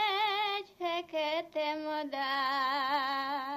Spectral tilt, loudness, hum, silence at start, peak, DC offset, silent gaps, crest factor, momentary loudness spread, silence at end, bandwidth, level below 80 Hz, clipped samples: -2.5 dB/octave; -32 LUFS; none; 0 s; -20 dBFS; under 0.1%; none; 14 dB; 6 LU; 0 s; 15 kHz; -84 dBFS; under 0.1%